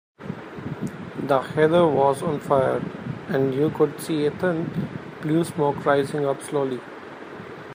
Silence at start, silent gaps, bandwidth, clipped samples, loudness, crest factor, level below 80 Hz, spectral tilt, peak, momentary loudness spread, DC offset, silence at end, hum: 0.2 s; none; 15.5 kHz; under 0.1%; -23 LUFS; 18 dB; -60 dBFS; -7 dB/octave; -6 dBFS; 16 LU; under 0.1%; 0 s; none